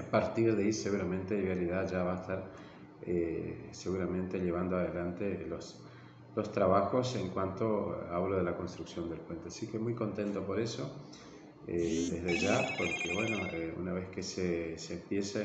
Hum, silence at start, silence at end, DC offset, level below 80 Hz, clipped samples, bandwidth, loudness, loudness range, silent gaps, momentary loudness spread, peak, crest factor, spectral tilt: none; 0 s; 0 s; under 0.1%; -62 dBFS; under 0.1%; 8.6 kHz; -35 LUFS; 3 LU; none; 13 LU; -14 dBFS; 20 dB; -5.5 dB/octave